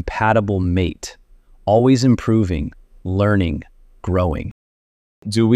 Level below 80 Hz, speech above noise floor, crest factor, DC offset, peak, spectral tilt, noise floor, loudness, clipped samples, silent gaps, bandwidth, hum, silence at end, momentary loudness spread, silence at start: -36 dBFS; over 73 dB; 16 dB; under 0.1%; -4 dBFS; -7 dB/octave; under -90 dBFS; -18 LUFS; under 0.1%; 4.51-5.22 s; 12 kHz; none; 0 s; 18 LU; 0 s